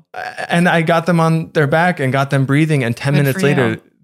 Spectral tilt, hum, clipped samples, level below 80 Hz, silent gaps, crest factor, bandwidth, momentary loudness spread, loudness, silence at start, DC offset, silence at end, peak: -6.5 dB/octave; none; under 0.1%; -58 dBFS; none; 14 dB; 14.5 kHz; 4 LU; -15 LUFS; 0.15 s; under 0.1%; 0.25 s; -2 dBFS